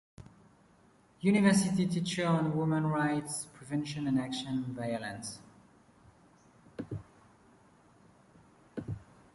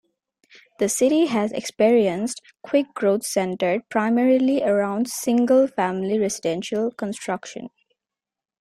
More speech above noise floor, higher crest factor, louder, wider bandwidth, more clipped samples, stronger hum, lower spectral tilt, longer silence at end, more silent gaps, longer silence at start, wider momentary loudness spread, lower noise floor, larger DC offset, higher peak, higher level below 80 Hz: second, 33 dB vs 68 dB; first, 22 dB vs 16 dB; second, -32 LUFS vs -21 LUFS; second, 11.5 kHz vs 15.5 kHz; neither; neither; about the same, -5.5 dB/octave vs -4.5 dB/octave; second, 0.3 s vs 0.9 s; neither; second, 0.2 s vs 0.8 s; first, 18 LU vs 11 LU; second, -64 dBFS vs -89 dBFS; neither; second, -14 dBFS vs -6 dBFS; about the same, -64 dBFS vs -66 dBFS